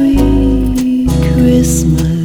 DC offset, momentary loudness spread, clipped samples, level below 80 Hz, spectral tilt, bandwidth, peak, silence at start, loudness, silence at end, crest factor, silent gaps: under 0.1%; 4 LU; under 0.1%; -18 dBFS; -6.5 dB/octave; 18 kHz; 0 dBFS; 0 s; -11 LUFS; 0 s; 10 dB; none